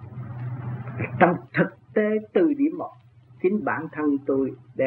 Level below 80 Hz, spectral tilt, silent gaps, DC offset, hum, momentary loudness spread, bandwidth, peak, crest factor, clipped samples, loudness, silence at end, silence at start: -64 dBFS; -11 dB/octave; none; under 0.1%; none; 13 LU; 4.3 kHz; -2 dBFS; 22 dB; under 0.1%; -25 LUFS; 0 s; 0 s